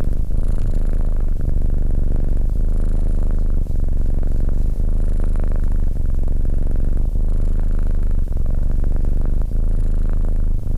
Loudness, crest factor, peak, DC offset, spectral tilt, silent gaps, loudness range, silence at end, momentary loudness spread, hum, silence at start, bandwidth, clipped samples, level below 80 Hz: -24 LUFS; 6 dB; -8 dBFS; under 0.1%; -9.5 dB/octave; none; 0 LU; 0 s; 1 LU; none; 0 s; 1.8 kHz; under 0.1%; -18 dBFS